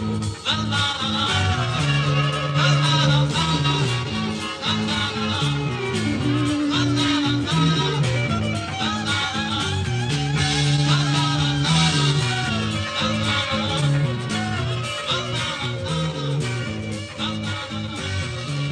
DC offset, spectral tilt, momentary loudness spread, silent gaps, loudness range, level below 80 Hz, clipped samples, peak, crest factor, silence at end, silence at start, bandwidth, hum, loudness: under 0.1%; -4.5 dB/octave; 8 LU; none; 5 LU; -44 dBFS; under 0.1%; -4 dBFS; 18 dB; 0 s; 0 s; 11 kHz; none; -21 LUFS